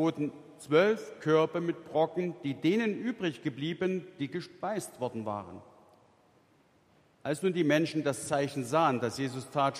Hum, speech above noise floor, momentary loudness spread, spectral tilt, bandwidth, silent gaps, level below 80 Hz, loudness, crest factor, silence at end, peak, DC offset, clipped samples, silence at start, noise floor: none; 35 dB; 10 LU; -5.5 dB/octave; 15.5 kHz; none; -74 dBFS; -31 LUFS; 20 dB; 0 s; -12 dBFS; under 0.1%; under 0.1%; 0 s; -66 dBFS